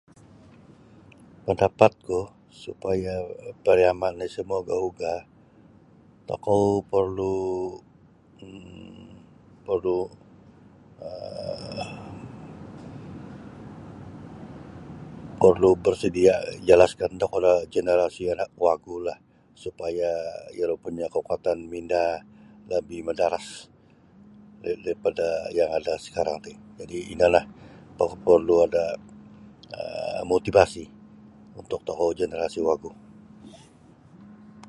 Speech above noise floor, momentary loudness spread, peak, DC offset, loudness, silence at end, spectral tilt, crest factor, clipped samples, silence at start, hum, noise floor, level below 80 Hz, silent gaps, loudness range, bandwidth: 31 dB; 22 LU; 0 dBFS; under 0.1%; -25 LUFS; 0.05 s; -6 dB/octave; 26 dB; under 0.1%; 1.45 s; none; -55 dBFS; -52 dBFS; none; 12 LU; 11.5 kHz